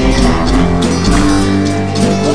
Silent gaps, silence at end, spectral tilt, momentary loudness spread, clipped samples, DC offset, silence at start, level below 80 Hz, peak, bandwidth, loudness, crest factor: none; 0 s; -5.5 dB/octave; 3 LU; under 0.1%; 6%; 0 s; -18 dBFS; 0 dBFS; 11 kHz; -12 LUFS; 12 dB